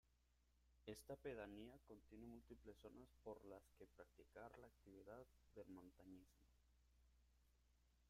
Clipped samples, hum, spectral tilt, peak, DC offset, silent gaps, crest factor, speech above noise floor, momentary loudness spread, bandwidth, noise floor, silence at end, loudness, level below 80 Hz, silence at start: under 0.1%; 60 Hz at -75 dBFS; -5.5 dB/octave; -42 dBFS; under 0.1%; none; 20 dB; 20 dB; 11 LU; 15.5 kHz; -82 dBFS; 0 s; -62 LUFS; -76 dBFS; 0.05 s